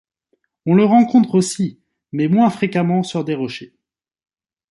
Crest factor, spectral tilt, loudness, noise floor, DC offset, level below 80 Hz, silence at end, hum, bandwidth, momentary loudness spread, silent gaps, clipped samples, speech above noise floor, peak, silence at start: 16 dB; -6.5 dB/octave; -17 LUFS; -68 dBFS; under 0.1%; -62 dBFS; 1.05 s; none; 11.5 kHz; 14 LU; none; under 0.1%; 52 dB; -2 dBFS; 0.65 s